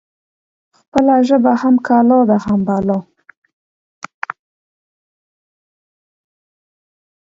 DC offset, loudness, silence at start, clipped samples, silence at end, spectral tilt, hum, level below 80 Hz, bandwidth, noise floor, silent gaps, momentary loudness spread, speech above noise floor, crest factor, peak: under 0.1%; -13 LUFS; 0.95 s; under 0.1%; 4.25 s; -8 dB/octave; none; -54 dBFS; 7.6 kHz; under -90 dBFS; none; 16 LU; over 78 dB; 18 dB; 0 dBFS